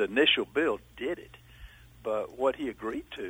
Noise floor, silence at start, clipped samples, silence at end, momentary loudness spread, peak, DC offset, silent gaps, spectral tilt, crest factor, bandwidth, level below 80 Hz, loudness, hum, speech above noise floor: -51 dBFS; 0 s; under 0.1%; 0 s; 13 LU; -10 dBFS; under 0.1%; none; -4.5 dB/octave; 20 dB; over 20 kHz; -58 dBFS; -30 LUFS; none; 21 dB